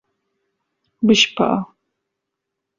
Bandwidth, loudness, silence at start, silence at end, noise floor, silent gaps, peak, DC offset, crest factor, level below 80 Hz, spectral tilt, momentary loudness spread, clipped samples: 7.6 kHz; -17 LUFS; 1 s; 1.15 s; -80 dBFS; none; -2 dBFS; under 0.1%; 20 dB; -58 dBFS; -3.5 dB/octave; 12 LU; under 0.1%